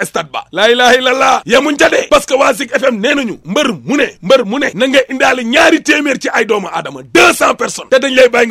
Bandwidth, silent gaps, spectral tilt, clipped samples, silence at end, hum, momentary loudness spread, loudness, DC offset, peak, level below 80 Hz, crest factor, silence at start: 16 kHz; none; -3 dB/octave; 0.4%; 0 s; none; 8 LU; -10 LUFS; under 0.1%; 0 dBFS; -46 dBFS; 10 dB; 0 s